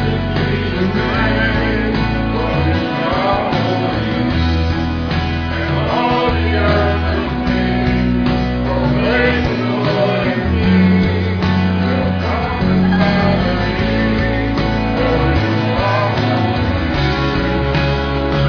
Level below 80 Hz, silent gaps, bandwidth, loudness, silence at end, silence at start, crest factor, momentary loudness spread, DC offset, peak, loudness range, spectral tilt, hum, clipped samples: -26 dBFS; none; 5.4 kHz; -16 LUFS; 0 s; 0 s; 14 dB; 4 LU; 0.3%; -2 dBFS; 2 LU; -8 dB/octave; none; under 0.1%